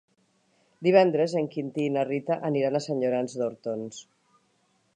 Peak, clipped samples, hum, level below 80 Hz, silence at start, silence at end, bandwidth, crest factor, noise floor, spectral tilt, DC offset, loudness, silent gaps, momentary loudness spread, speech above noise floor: -6 dBFS; under 0.1%; none; -82 dBFS; 0.8 s; 0.95 s; 9.8 kHz; 22 dB; -69 dBFS; -6.5 dB/octave; under 0.1%; -26 LUFS; none; 13 LU; 43 dB